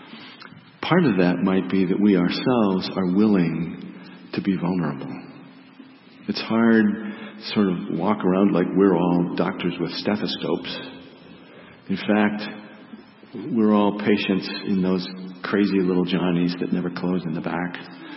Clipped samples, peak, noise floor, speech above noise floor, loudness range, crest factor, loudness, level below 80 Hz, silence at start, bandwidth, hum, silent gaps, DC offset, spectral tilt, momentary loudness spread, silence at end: under 0.1%; -4 dBFS; -47 dBFS; 25 dB; 6 LU; 18 dB; -22 LUFS; -62 dBFS; 0 s; 5.8 kHz; none; none; under 0.1%; -10.5 dB/octave; 17 LU; 0 s